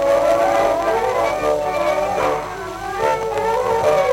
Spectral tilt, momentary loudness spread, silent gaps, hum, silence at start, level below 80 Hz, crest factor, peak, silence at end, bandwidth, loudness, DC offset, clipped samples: -4.5 dB/octave; 7 LU; none; none; 0 s; -44 dBFS; 14 dB; -4 dBFS; 0 s; 17 kHz; -18 LUFS; under 0.1%; under 0.1%